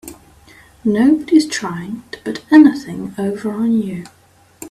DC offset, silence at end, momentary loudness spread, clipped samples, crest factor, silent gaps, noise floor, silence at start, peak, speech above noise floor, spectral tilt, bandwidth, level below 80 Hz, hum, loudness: under 0.1%; 0 s; 18 LU; under 0.1%; 16 dB; none; -45 dBFS; 0.05 s; 0 dBFS; 31 dB; -5.5 dB/octave; 14.5 kHz; -54 dBFS; none; -15 LUFS